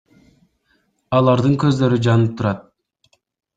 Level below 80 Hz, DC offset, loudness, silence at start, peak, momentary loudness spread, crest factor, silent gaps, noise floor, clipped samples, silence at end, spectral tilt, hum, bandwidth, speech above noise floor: -52 dBFS; under 0.1%; -17 LUFS; 1.1 s; -2 dBFS; 8 LU; 16 dB; none; -64 dBFS; under 0.1%; 0.95 s; -8 dB/octave; none; 7.8 kHz; 49 dB